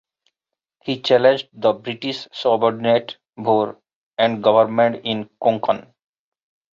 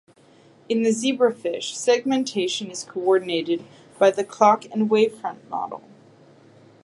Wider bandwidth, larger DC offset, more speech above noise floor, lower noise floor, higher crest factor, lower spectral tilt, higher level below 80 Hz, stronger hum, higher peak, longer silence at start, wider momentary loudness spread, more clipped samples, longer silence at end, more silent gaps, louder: second, 7.4 kHz vs 11.5 kHz; neither; first, 67 dB vs 32 dB; first, -85 dBFS vs -53 dBFS; about the same, 18 dB vs 20 dB; first, -6 dB/octave vs -4 dB/octave; first, -66 dBFS vs -78 dBFS; neither; about the same, -2 dBFS vs -4 dBFS; first, 0.85 s vs 0.7 s; about the same, 12 LU vs 12 LU; neither; about the same, 0.95 s vs 1.05 s; first, 3.95-4.11 s vs none; first, -19 LUFS vs -22 LUFS